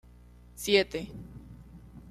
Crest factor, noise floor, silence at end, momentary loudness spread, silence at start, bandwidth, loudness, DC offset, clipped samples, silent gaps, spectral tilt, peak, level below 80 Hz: 22 dB; -53 dBFS; 0 s; 25 LU; 0.55 s; 14.5 kHz; -28 LUFS; under 0.1%; under 0.1%; none; -3.5 dB/octave; -12 dBFS; -54 dBFS